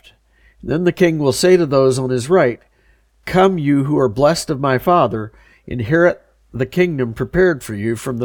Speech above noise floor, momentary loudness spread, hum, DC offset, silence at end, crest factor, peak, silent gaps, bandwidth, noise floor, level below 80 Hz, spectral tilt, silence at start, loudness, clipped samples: 40 dB; 13 LU; none; under 0.1%; 0 s; 16 dB; -2 dBFS; none; 18.5 kHz; -55 dBFS; -44 dBFS; -6 dB/octave; 0.65 s; -16 LUFS; under 0.1%